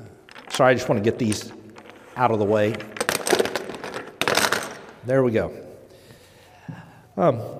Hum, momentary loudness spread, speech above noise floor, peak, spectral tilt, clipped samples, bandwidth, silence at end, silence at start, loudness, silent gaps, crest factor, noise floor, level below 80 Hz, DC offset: none; 22 LU; 29 dB; -2 dBFS; -4.5 dB/octave; under 0.1%; 16 kHz; 0 s; 0 s; -22 LUFS; none; 22 dB; -50 dBFS; -60 dBFS; under 0.1%